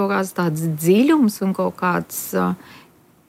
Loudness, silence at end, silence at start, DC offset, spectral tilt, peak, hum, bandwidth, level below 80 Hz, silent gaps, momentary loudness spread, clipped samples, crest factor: -19 LUFS; 0.5 s; 0 s; under 0.1%; -6 dB/octave; -4 dBFS; none; 16.5 kHz; -64 dBFS; none; 9 LU; under 0.1%; 14 dB